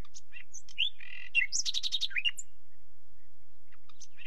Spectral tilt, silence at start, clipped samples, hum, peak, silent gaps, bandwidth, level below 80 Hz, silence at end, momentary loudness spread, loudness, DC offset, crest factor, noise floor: 2 dB/octave; 0.15 s; under 0.1%; none; -14 dBFS; none; 16 kHz; -70 dBFS; 0.05 s; 19 LU; -31 LUFS; 3%; 20 dB; -67 dBFS